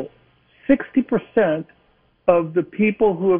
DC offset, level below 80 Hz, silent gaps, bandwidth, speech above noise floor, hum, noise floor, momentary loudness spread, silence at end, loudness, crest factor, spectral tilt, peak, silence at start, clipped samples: under 0.1%; -52 dBFS; none; 3.7 kHz; 42 dB; none; -60 dBFS; 12 LU; 0 s; -20 LUFS; 18 dB; -10.5 dB/octave; -2 dBFS; 0 s; under 0.1%